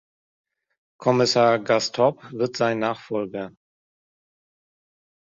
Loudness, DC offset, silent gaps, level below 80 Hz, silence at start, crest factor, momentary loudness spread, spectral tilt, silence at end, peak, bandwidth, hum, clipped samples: -22 LUFS; under 0.1%; none; -66 dBFS; 1 s; 20 dB; 11 LU; -4.5 dB/octave; 1.8 s; -4 dBFS; 8 kHz; none; under 0.1%